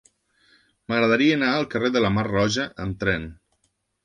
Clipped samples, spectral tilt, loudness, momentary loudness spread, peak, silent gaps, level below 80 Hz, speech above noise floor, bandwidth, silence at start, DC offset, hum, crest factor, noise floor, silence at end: under 0.1%; -5.5 dB/octave; -22 LUFS; 9 LU; -6 dBFS; none; -48 dBFS; 49 dB; 10.5 kHz; 0.9 s; under 0.1%; none; 18 dB; -71 dBFS; 0.7 s